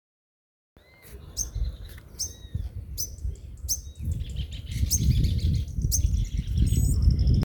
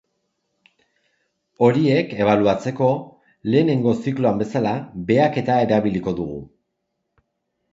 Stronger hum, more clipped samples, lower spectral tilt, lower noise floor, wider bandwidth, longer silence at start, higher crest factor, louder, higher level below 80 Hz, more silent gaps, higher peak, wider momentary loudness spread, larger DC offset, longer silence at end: neither; neither; second, -4.5 dB/octave vs -8 dB/octave; second, -47 dBFS vs -76 dBFS; first, over 20 kHz vs 7.8 kHz; second, 1.05 s vs 1.6 s; about the same, 18 dB vs 20 dB; second, -28 LUFS vs -20 LUFS; first, -30 dBFS vs -54 dBFS; neither; second, -8 dBFS vs -2 dBFS; first, 14 LU vs 10 LU; neither; second, 0 s vs 1.25 s